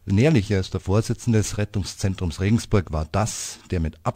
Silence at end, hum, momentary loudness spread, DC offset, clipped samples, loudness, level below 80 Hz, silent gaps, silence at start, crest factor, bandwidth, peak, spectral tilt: 0.05 s; none; 9 LU; under 0.1%; under 0.1%; -23 LUFS; -38 dBFS; none; 0.05 s; 18 dB; 15.5 kHz; -6 dBFS; -6 dB/octave